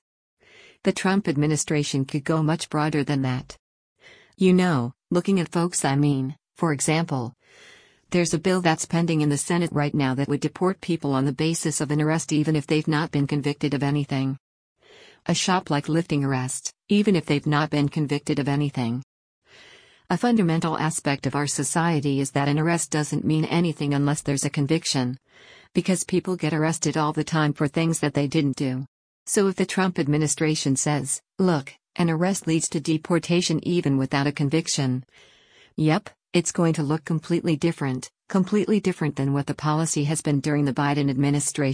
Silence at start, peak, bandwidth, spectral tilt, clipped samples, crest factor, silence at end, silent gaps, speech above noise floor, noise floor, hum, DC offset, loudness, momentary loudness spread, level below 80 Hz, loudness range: 0.85 s; -8 dBFS; 10.5 kHz; -5 dB/octave; under 0.1%; 16 dB; 0 s; 3.59-3.96 s, 14.40-14.76 s, 19.03-19.42 s, 28.88-29.26 s; 30 dB; -52 dBFS; none; under 0.1%; -24 LUFS; 5 LU; -58 dBFS; 2 LU